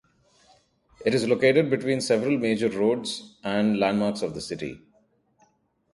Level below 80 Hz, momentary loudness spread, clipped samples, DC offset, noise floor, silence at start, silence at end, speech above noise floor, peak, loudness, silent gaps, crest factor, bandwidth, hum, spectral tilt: -62 dBFS; 13 LU; under 0.1%; under 0.1%; -66 dBFS; 1 s; 1.15 s; 42 dB; -8 dBFS; -24 LUFS; none; 18 dB; 11.5 kHz; none; -5.5 dB/octave